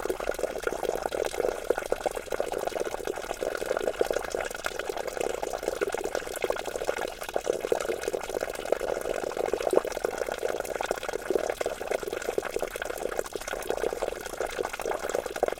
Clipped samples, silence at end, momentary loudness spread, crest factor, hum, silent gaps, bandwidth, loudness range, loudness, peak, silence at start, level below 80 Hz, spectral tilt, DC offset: under 0.1%; 0 s; 4 LU; 24 dB; none; none; 17 kHz; 2 LU; -31 LUFS; -6 dBFS; 0 s; -50 dBFS; -3 dB/octave; under 0.1%